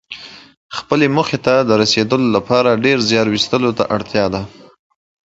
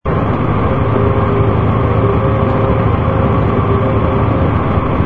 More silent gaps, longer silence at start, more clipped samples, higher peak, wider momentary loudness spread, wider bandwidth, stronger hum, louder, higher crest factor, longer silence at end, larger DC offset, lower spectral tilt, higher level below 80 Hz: first, 0.57-0.70 s vs none; about the same, 0.1 s vs 0 s; neither; about the same, 0 dBFS vs 0 dBFS; first, 15 LU vs 2 LU; first, 8 kHz vs 4.3 kHz; neither; about the same, -15 LUFS vs -13 LUFS; about the same, 16 dB vs 12 dB; first, 0.8 s vs 0 s; second, under 0.1% vs 3%; second, -5 dB/octave vs -10.5 dB/octave; second, -48 dBFS vs -24 dBFS